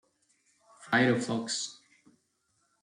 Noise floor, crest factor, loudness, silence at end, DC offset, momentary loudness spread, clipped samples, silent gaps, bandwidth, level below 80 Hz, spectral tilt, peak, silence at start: -75 dBFS; 22 dB; -29 LUFS; 1.1 s; under 0.1%; 9 LU; under 0.1%; none; 11 kHz; -76 dBFS; -4 dB/octave; -12 dBFS; 0.8 s